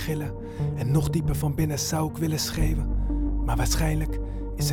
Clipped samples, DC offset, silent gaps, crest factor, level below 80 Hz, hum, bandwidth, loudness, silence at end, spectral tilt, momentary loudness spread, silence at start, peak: under 0.1%; under 0.1%; none; 14 dB; -30 dBFS; none; 18 kHz; -27 LUFS; 0 s; -5.5 dB/octave; 7 LU; 0 s; -10 dBFS